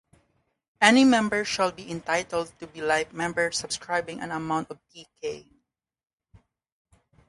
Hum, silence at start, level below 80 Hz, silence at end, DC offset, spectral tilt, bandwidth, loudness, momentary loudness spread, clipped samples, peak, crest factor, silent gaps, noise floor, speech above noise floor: none; 0.8 s; -62 dBFS; 1.9 s; under 0.1%; -3.5 dB/octave; 11.5 kHz; -25 LUFS; 17 LU; under 0.1%; -2 dBFS; 26 dB; none; -80 dBFS; 55 dB